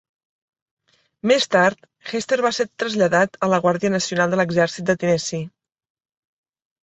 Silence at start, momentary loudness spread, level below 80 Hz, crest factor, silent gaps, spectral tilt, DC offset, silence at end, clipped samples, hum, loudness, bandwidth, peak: 1.25 s; 10 LU; -62 dBFS; 20 dB; none; -4.5 dB/octave; under 0.1%; 1.35 s; under 0.1%; none; -20 LUFS; 8.2 kHz; -2 dBFS